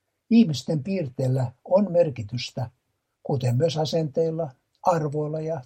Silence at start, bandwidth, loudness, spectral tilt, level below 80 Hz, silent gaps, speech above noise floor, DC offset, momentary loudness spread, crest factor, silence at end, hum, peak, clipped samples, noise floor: 0.3 s; 15.5 kHz; -25 LUFS; -7.5 dB/octave; -64 dBFS; none; 24 dB; under 0.1%; 12 LU; 18 dB; 0 s; none; -8 dBFS; under 0.1%; -48 dBFS